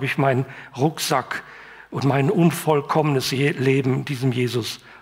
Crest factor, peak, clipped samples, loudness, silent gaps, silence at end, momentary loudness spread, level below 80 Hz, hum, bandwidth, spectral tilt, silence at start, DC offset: 16 dB; -4 dBFS; under 0.1%; -21 LUFS; none; 0.05 s; 12 LU; -62 dBFS; none; 16 kHz; -5.5 dB/octave; 0 s; under 0.1%